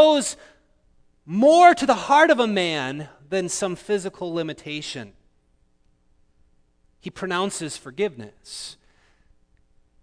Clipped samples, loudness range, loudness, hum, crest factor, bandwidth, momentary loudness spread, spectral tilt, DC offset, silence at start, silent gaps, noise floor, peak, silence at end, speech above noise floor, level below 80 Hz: under 0.1%; 14 LU; -21 LUFS; none; 22 dB; 11 kHz; 21 LU; -3.5 dB/octave; under 0.1%; 0 s; none; -62 dBFS; 0 dBFS; 1.3 s; 42 dB; -60 dBFS